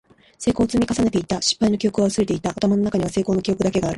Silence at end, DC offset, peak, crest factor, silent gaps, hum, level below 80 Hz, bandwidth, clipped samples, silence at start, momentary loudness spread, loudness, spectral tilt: 0 s; under 0.1%; -6 dBFS; 14 dB; none; none; -44 dBFS; 11.5 kHz; under 0.1%; 0.4 s; 3 LU; -21 LUFS; -5 dB/octave